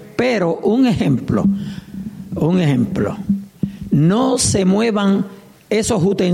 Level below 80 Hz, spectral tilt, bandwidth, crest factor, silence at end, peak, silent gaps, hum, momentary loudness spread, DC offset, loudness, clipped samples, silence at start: -42 dBFS; -6 dB/octave; 14.5 kHz; 14 dB; 0 s; -4 dBFS; none; none; 12 LU; under 0.1%; -17 LUFS; under 0.1%; 0 s